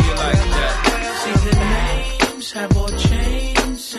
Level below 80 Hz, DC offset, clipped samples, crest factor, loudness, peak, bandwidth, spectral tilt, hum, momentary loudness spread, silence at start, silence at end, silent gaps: -20 dBFS; under 0.1%; under 0.1%; 14 dB; -18 LUFS; -2 dBFS; 14 kHz; -4.5 dB/octave; none; 4 LU; 0 s; 0 s; none